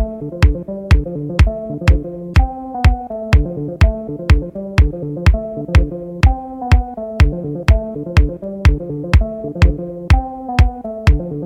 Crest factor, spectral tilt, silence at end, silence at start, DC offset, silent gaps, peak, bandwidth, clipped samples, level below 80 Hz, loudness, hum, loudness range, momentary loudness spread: 14 dB; -7.5 dB/octave; 0 s; 0 s; under 0.1%; none; 0 dBFS; 9.8 kHz; under 0.1%; -16 dBFS; -17 LUFS; none; 1 LU; 6 LU